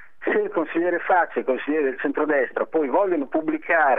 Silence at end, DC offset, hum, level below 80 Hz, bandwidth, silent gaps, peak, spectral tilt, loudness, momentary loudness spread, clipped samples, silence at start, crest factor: 0 s; 0.8%; none; -74 dBFS; 3.9 kHz; none; -6 dBFS; -8 dB/octave; -23 LUFS; 4 LU; under 0.1%; 0.2 s; 16 dB